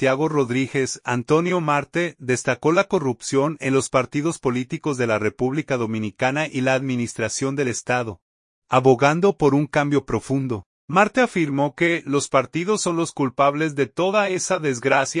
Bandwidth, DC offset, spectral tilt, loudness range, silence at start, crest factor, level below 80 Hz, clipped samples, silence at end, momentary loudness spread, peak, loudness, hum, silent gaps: 11 kHz; under 0.1%; -5 dB/octave; 3 LU; 0 s; 18 dB; -56 dBFS; under 0.1%; 0 s; 6 LU; -2 dBFS; -21 LUFS; none; 8.22-8.62 s, 10.66-10.88 s